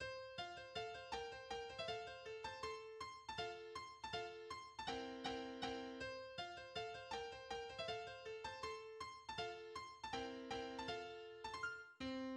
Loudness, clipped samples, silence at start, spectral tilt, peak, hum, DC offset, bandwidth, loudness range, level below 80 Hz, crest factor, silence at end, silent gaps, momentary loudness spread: -49 LUFS; under 0.1%; 0 s; -3.5 dB/octave; -32 dBFS; none; under 0.1%; 11.5 kHz; 1 LU; -72 dBFS; 18 dB; 0 s; none; 5 LU